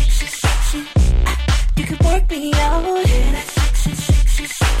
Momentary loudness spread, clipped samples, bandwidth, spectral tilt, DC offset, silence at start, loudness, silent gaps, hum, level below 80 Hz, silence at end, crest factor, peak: 3 LU; under 0.1%; 15.5 kHz; -4.5 dB/octave; under 0.1%; 0 s; -18 LUFS; none; none; -16 dBFS; 0 s; 12 dB; -2 dBFS